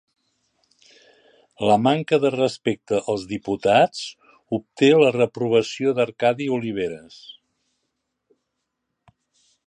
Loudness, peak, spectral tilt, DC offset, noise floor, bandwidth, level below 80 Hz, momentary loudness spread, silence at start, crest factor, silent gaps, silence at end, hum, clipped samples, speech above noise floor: -21 LUFS; -4 dBFS; -5.5 dB/octave; under 0.1%; -78 dBFS; 10 kHz; -62 dBFS; 12 LU; 1.6 s; 20 dB; none; 2.65 s; none; under 0.1%; 58 dB